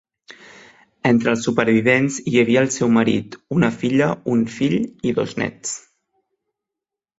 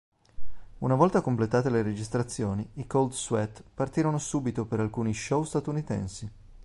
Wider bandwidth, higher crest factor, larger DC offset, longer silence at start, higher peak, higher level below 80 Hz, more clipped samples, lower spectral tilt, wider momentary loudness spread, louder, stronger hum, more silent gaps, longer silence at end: second, 8 kHz vs 11.5 kHz; about the same, 18 dB vs 20 dB; neither; about the same, 0.3 s vs 0.4 s; first, -2 dBFS vs -8 dBFS; about the same, -56 dBFS vs -52 dBFS; neither; about the same, -5.5 dB/octave vs -6.5 dB/octave; about the same, 8 LU vs 10 LU; first, -19 LUFS vs -29 LUFS; neither; neither; first, 1.4 s vs 0 s